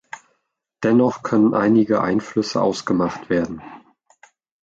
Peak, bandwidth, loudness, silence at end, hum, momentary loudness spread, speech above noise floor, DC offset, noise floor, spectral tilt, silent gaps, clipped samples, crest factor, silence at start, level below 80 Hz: -6 dBFS; 8 kHz; -19 LUFS; 0.85 s; none; 12 LU; 53 dB; under 0.1%; -72 dBFS; -6.5 dB/octave; none; under 0.1%; 16 dB; 0.15 s; -56 dBFS